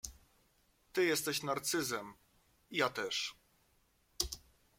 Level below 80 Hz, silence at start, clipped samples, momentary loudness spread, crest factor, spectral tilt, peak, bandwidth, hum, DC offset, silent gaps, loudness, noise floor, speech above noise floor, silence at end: -62 dBFS; 0.05 s; under 0.1%; 11 LU; 24 dB; -2.5 dB/octave; -14 dBFS; 16.5 kHz; none; under 0.1%; none; -36 LUFS; -73 dBFS; 37 dB; 0.4 s